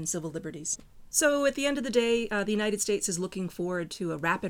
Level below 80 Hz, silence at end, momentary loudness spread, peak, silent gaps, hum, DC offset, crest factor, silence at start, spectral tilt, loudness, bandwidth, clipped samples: -56 dBFS; 0 s; 9 LU; -10 dBFS; none; none; under 0.1%; 18 dB; 0 s; -3.5 dB/octave; -29 LUFS; over 20 kHz; under 0.1%